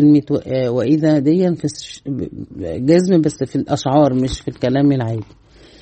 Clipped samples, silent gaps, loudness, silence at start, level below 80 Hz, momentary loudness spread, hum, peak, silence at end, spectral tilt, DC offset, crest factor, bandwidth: under 0.1%; none; -17 LUFS; 0 s; -44 dBFS; 13 LU; none; -2 dBFS; 0.6 s; -7.5 dB/octave; under 0.1%; 14 dB; 8.8 kHz